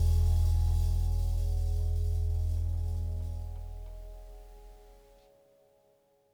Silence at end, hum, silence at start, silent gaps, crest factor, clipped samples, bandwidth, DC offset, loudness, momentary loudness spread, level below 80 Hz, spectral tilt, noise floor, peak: 1.4 s; none; 0 s; none; 12 dB; under 0.1%; 15.5 kHz; under 0.1%; -32 LUFS; 20 LU; -32 dBFS; -7 dB/octave; -68 dBFS; -18 dBFS